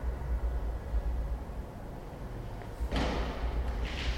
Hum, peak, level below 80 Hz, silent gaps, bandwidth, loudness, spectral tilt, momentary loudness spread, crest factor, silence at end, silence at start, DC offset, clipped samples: none; -20 dBFS; -34 dBFS; none; 10.5 kHz; -37 LUFS; -6 dB/octave; 10 LU; 14 dB; 0 s; 0 s; under 0.1%; under 0.1%